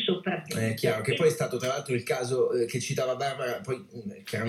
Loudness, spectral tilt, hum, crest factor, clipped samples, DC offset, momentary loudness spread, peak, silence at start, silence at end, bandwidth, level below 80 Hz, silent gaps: -29 LUFS; -5 dB/octave; none; 18 dB; under 0.1%; under 0.1%; 10 LU; -12 dBFS; 0 s; 0 s; 15.5 kHz; -70 dBFS; none